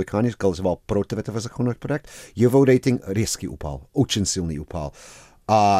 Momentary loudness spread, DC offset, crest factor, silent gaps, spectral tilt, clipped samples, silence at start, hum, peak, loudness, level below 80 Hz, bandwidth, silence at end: 14 LU; under 0.1%; 16 dB; none; -5.5 dB/octave; under 0.1%; 0 s; none; -6 dBFS; -23 LUFS; -46 dBFS; 15.5 kHz; 0 s